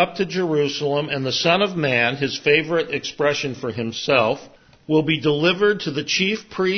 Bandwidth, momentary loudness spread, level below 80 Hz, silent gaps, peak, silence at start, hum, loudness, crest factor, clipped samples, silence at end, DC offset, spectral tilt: 6.6 kHz; 7 LU; -60 dBFS; none; -2 dBFS; 0 s; none; -20 LUFS; 18 dB; under 0.1%; 0 s; under 0.1%; -4.5 dB/octave